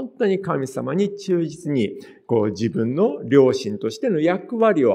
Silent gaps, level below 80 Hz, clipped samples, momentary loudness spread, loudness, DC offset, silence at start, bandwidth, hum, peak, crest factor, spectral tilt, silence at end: none; -66 dBFS; under 0.1%; 8 LU; -21 LUFS; under 0.1%; 0 s; 11.5 kHz; none; -2 dBFS; 18 dB; -7 dB/octave; 0 s